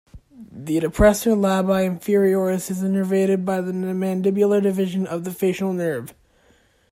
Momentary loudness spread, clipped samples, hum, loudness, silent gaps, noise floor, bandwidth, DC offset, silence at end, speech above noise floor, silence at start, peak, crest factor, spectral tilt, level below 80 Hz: 9 LU; under 0.1%; none; -21 LUFS; none; -58 dBFS; 16 kHz; under 0.1%; 0.8 s; 38 dB; 0.15 s; -2 dBFS; 18 dB; -6.5 dB/octave; -40 dBFS